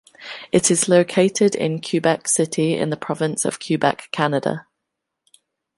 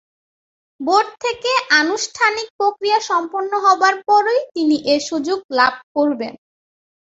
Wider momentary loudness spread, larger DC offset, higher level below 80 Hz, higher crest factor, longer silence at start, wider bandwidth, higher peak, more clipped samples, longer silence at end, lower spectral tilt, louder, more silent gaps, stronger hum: about the same, 8 LU vs 8 LU; neither; about the same, -64 dBFS vs -64 dBFS; about the same, 18 dB vs 18 dB; second, 0.2 s vs 0.8 s; first, 11.5 kHz vs 8 kHz; about the same, -2 dBFS vs 0 dBFS; neither; first, 1.15 s vs 0.85 s; first, -4 dB/octave vs -1.5 dB/octave; about the same, -19 LUFS vs -17 LUFS; second, none vs 2.50-2.59 s, 5.44-5.49 s, 5.83-5.95 s; neither